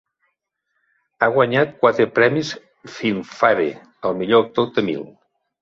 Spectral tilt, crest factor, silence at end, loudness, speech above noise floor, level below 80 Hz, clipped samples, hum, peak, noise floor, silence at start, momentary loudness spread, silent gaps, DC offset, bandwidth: -6 dB/octave; 18 dB; 0.55 s; -19 LUFS; 55 dB; -60 dBFS; under 0.1%; none; -2 dBFS; -74 dBFS; 1.2 s; 13 LU; none; under 0.1%; 7.6 kHz